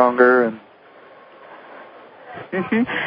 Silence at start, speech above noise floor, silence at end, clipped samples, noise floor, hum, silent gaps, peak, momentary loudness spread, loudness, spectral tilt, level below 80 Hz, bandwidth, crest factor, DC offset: 0 s; 29 dB; 0 s; under 0.1%; -46 dBFS; none; none; -2 dBFS; 27 LU; -18 LUFS; -10.5 dB/octave; -64 dBFS; 5.2 kHz; 20 dB; under 0.1%